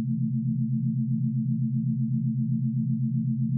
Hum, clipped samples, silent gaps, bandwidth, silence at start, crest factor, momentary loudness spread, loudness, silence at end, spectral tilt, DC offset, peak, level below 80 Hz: none; under 0.1%; none; 0.3 kHz; 0 s; 10 dB; 0 LU; -27 LUFS; 0 s; -20 dB/octave; under 0.1%; -16 dBFS; -76 dBFS